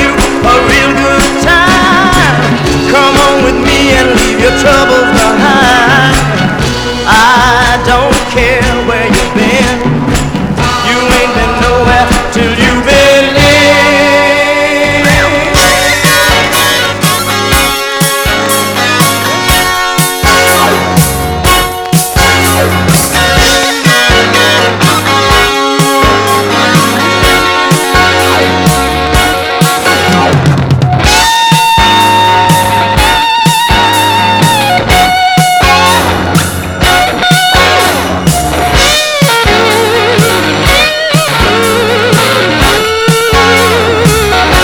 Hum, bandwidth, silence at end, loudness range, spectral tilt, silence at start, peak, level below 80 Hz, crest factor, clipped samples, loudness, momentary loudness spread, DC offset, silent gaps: none; over 20 kHz; 0 s; 2 LU; -3.5 dB/octave; 0 s; 0 dBFS; -20 dBFS; 8 dB; 2%; -6 LUFS; 4 LU; under 0.1%; none